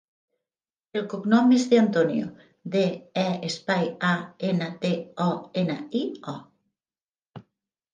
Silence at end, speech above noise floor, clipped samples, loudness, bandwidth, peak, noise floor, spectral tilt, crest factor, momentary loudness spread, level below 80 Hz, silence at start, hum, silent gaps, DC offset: 0.5 s; over 66 dB; under 0.1%; -25 LUFS; 9.6 kHz; -6 dBFS; under -90 dBFS; -6 dB/octave; 20 dB; 14 LU; -74 dBFS; 0.95 s; none; 7.02-7.12 s, 7.26-7.30 s; under 0.1%